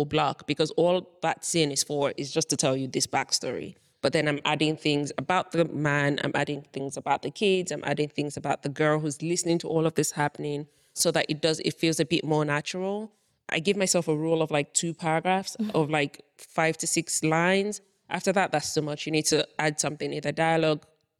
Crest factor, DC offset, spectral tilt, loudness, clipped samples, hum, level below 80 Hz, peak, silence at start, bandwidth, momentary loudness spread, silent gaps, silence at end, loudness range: 18 dB; under 0.1%; -4 dB/octave; -27 LUFS; under 0.1%; none; -66 dBFS; -10 dBFS; 0 s; 16.5 kHz; 7 LU; none; 0.4 s; 1 LU